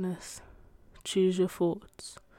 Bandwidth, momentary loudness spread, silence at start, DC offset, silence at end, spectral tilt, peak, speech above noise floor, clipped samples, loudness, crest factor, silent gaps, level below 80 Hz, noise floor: 16 kHz; 18 LU; 0 s; under 0.1%; 0.25 s; -5.5 dB/octave; -18 dBFS; 24 dB; under 0.1%; -30 LUFS; 16 dB; none; -60 dBFS; -55 dBFS